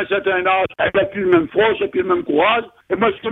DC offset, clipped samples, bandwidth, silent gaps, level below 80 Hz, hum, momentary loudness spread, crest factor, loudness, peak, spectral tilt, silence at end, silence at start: under 0.1%; under 0.1%; 4 kHz; none; -52 dBFS; none; 4 LU; 16 dB; -17 LUFS; -2 dBFS; -7.5 dB/octave; 0 s; 0 s